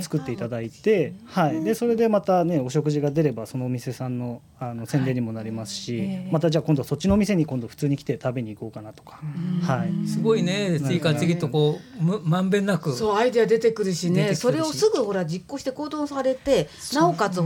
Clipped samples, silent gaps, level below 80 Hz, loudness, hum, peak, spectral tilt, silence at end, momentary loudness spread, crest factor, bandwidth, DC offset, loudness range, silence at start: under 0.1%; none; -50 dBFS; -24 LUFS; none; -8 dBFS; -6.5 dB/octave; 0 s; 10 LU; 16 dB; 17 kHz; under 0.1%; 4 LU; 0 s